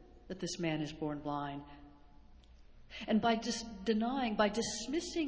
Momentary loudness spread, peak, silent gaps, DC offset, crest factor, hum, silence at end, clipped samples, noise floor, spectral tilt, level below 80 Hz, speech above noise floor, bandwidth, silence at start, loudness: 14 LU; -16 dBFS; none; under 0.1%; 20 dB; none; 0 s; under 0.1%; -58 dBFS; -4.5 dB/octave; -60 dBFS; 22 dB; 8 kHz; 0 s; -36 LUFS